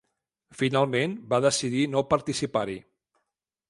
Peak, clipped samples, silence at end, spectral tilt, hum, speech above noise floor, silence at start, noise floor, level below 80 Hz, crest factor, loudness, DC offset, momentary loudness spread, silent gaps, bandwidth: -8 dBFS; under 0.1%; 0.9 s; -4.5 dB/octave; none; 58 dB; 0.6 s; -83 dBFS; -60 dBFS; 20 dB; -26 LUFS; under 0.1%; 6 LU; none; 11.5 kHz